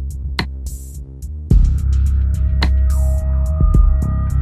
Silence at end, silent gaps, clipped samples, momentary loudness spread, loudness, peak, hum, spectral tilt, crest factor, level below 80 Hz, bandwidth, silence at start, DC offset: 0 s; none; under 0.1%; 15 LU; -17 LUFS; 0 dBFS; none; -6.5 dB/octave; 14 dB; -16 dBFS; 12 kHz; 0 s; under 0.1%